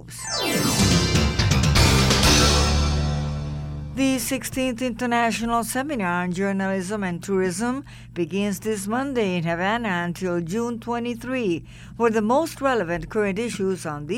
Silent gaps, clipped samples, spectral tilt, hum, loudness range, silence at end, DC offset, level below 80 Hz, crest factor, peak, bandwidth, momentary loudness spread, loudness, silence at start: none; under 0.1%; -4.5 dB/octave; none; 6 LU; 0 s; under 0.1%; -32 dBFS; 16 dB; -6 dBFS; 17 kHz; 11 LU; -22 LUFS; 0 s